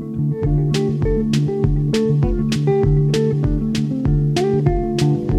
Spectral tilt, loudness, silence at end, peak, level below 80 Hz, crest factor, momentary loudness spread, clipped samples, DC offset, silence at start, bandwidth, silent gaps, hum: -7.5 dB/octave; -18 LUFS; 0 s; -4 dBFS; -26 dBFS; 14 dB; 3 LU; under 0.1%; under 0.1%; 0 s; 11 kHz; none; none